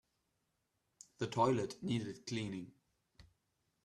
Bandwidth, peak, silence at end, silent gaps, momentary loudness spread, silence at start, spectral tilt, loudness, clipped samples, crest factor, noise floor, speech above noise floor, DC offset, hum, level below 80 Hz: 12.5 kHz; -20 dBFS; 0.65 s; none; 12 LU; 1.2 s; -6 dB/octave; -39 LUFS; under 0.1%; 22 dB; -84 dBFS; 46 dB; under 0.1%; none; -72 dBFS